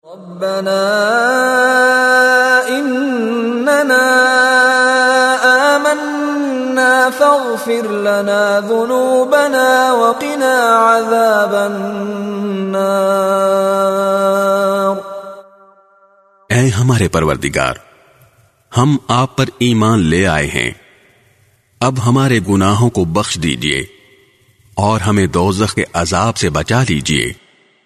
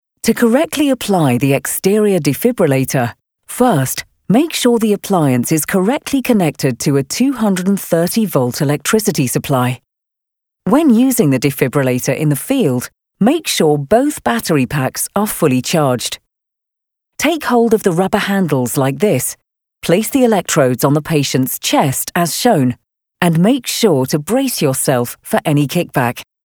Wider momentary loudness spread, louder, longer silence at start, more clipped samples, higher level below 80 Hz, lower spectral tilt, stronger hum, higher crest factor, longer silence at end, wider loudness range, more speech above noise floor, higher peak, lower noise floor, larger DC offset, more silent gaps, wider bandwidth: first, 9 LU vs 5 LU; about the same, -13 LUFS vs -14 LUFS; second, 0.05 s vs 0.25 s; neither; first, -40 dBFS vs -50 dBFS; about the same, -5 dB/octave vs -5 dB/octave; neither; about the same, 14 dB vs 14 dB; first, 0.5 s vs 0.2 s; first, 5 LU vs 2 LU; second, 40 dB vs 66 dB; about the same, 0 dBFS vs 0 dBFS; second, -53 dBFS vs -80 dBFS; neither; neither; second, 13.5 kHz vs over 20 kHz